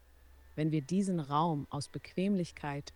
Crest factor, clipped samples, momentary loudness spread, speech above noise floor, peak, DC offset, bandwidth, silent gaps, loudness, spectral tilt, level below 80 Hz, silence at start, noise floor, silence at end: 18 dB; under 0.1%; 9 LU; 25 dB; -18 dBFS; under 0.1%; 11.5 kHz; none; -34 LUFS; -6.5 dB/octave; -62 dBFS; 0.35 s; -59 dBFS; 0.05 s